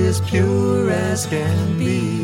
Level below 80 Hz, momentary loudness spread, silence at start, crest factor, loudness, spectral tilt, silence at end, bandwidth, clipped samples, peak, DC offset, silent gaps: -48 dBFS; 3 LU; 0 s; 12 dB; -19 LUFS; -6 dB/octave; 0 s; 16 kHz; under 0.1%; -6 dBFS; under 0.1%; none